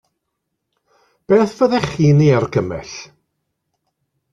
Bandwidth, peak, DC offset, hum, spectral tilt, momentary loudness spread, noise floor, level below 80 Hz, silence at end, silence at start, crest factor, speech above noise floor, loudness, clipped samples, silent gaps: 7.6 kHz; -2 dBFS; under 0.1%; none; -7.5 dB/octave; 17 LU; -76 dBFS; -50 dBFS; 1.25 s; 1.3 s; 16 dB; 61 dB; -15 LUFS; under 0.1%; none